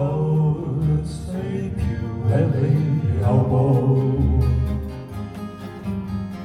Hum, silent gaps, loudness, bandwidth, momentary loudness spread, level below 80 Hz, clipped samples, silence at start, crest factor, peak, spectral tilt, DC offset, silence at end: none; none; -21 LUFS; 10.5 kHz; 14 LU; -32 dBFS; under 0.1%; 0 s; 14 dB; -6 dBFS; -9.5 dB/octave; under 0.1%; 0 s